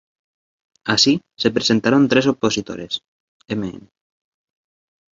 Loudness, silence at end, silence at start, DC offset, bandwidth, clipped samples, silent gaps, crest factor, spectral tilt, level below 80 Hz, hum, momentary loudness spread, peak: -18 LUFS; 1.35 s; 0.85 s; under 0.1%; 7.8 kHz; under 0.1%; 3.08-3.40 s; 20 dB; -4 dB/octave; -56 dBFS; none; 13 LU; -2 dBFS